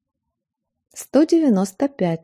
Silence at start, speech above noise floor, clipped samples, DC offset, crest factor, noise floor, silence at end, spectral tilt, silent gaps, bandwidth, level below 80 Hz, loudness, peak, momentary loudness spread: 0.95 s; 62 dB; under 0.1%; under 0.1%; 16 dB; -80 dBFS; 0.05 s; -6.5 dB/octave; none; 15.5 kHz; -66 dBFS; -19 LUFS; -4 dBFS; 7 LU